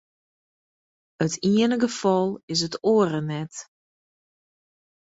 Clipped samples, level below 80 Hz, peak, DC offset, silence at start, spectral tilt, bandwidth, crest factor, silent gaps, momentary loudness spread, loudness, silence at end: under 0.1%; -64 dBFS; -8 dBFS; under 0.1%; 1.2 s; -5 dB/octave; 8 kHz; 18 dB; 2.43-2.48 s; 11 LU; -23 LUFS; 1.4 s